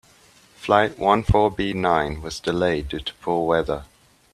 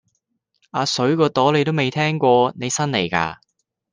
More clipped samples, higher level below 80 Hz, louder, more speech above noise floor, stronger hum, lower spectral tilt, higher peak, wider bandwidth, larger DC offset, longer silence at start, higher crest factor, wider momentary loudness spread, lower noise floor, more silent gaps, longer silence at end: neither; first, -38 dBFS vs -60 dBFS; second, -22 LUFS vs -19 LUFS; second, 32 dB vs 53 dB; neither; first, -6 dB/octave vs -4.5 dB/octave; about the same, -2 dBFS vs -2 dBFS; first, 13.5 kHz vs 10 kHz; neither; second, 0.6 s vs 0.75 s; about the same, 20 dB vs 18 dB; first, 10 LU vs 7 LU; second, -54 dBFS vs -72 dBFS; neither; about the same, 0.5 s vs 0.6 s